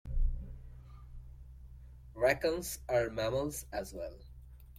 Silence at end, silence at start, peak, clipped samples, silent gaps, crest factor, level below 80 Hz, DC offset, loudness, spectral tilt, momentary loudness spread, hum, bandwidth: 0 s; 0.05 s; -14 dBFS; under 0.1%; none; 22 dB; -42 dBFS; under 0.1%; -35 LUFS; -4.5 dB/octave; 23 LU; none; 16.5 kHz